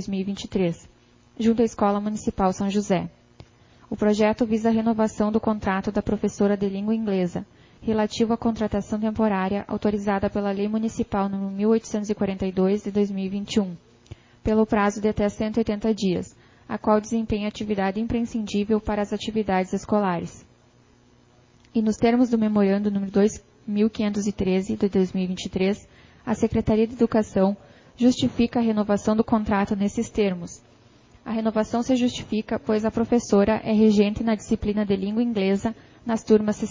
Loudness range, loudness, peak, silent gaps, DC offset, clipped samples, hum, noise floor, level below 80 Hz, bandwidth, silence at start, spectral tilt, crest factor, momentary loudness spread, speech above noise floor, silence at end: 3 LU; -24 LUFS; -6 dBFS; none; under 0.1%; under 0.1%; none; -56 dBFS; -46 dBFS; 7.6 kHz; 0 s; -6.5 dB/octave; 18 dB; 8 LU; 34 dB; 0 s